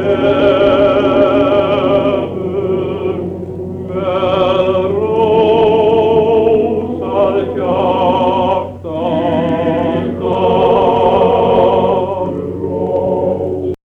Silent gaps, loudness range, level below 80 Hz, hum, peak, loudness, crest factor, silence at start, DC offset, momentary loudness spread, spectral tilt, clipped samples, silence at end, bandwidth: none; 3 LU; -42 dBFS; none; 0 dBFS; -13 LUFS; 12 dB; 0 s; under 0.1%; 8 LU; -8.5 dB/octave; under 0.1%; 0.1 s; 6.6 kHz